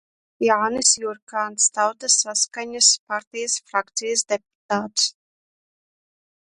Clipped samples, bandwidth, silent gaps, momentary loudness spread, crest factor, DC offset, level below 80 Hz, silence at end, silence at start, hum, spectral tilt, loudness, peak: under 0.1%; 11.5 kHz; 1.22-1.27 s, 3.00-3.07 s, 3.27-3.31 s, 4.55-4.69 s; 11 LU; 22 dB; under 0.1%; -70 dBFS; 1.35 s; 0.4 s; none; 0 dB/octave; -20 LUFS; 0 dBFS